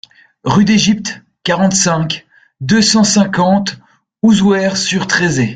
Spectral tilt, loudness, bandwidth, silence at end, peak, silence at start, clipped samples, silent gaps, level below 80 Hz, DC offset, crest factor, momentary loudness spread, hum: -4 dB/octave; -12 LUFS; 9.4 kHz; 0 s; 0 dBFS; 0.45 s; under 0.1%; none; -46 dBFS; under 0.1%; 14 dB; 12 LU; none